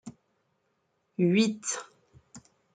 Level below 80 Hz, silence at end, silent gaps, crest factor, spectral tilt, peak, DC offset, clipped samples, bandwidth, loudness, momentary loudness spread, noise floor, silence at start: -76 dBFS; 0.35 s; none; 20 dB; -5 dB/octave; -12 dBFS; under 0.1%; under 0.1%; 9.4 kHz; -28 LUFS; 18 LU; -75 dBFS; 0.05 s